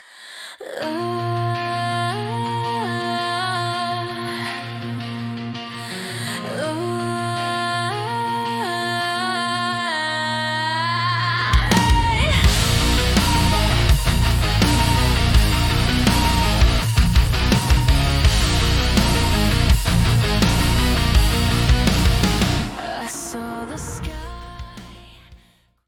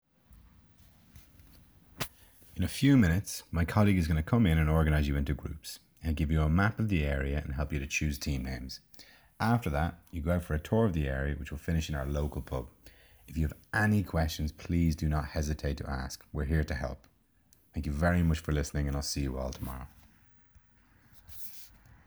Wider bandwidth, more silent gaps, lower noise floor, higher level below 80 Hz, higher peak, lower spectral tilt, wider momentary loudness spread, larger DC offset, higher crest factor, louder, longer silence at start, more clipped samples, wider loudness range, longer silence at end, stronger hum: second, 18 kHz vs over 20 kHz; neither; second, -56 dBFS vs -66 dBFS; first, -24 dBFS vs -40 dBFS; first, -2 dBFS vs -10 dBFS; second, -4.5 dB/octave vs -6.5 dB/octave; about the same, 12 LU vs 14 LU; neither; about the same, 16 dB vs 20 dB; first, -20 LUFS vs -31 LUFS; second, 0.15 s vs 0.3 s; neither; about the same, 8 LU vs 6 LU; about the same, 0.5 s vs 0.4 s; neither